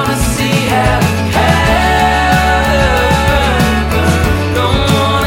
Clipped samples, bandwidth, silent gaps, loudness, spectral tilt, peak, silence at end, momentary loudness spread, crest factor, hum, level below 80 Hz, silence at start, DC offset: under 0.1%; 17 kHz; none; -11 LUFS; -5 dB/octave; 0 dBFS; 0 s; 3 LU; 10 dB; none; -20 dBFS; 0 s; under 0.1%